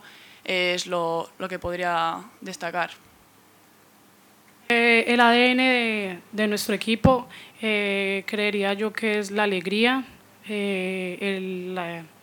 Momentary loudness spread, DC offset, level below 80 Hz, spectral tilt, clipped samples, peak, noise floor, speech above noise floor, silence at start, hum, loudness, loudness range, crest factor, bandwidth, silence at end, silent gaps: 14 LU; under 0.1%; -56 dBFS; -4.5 dB/octave; under 0.1%; -4 dBFS; -55 dBFS; 31 dB; 0.05 s; none; -23 LUFS; 9 LU; 22 dB; 19.5 kHz; 0.15 s; none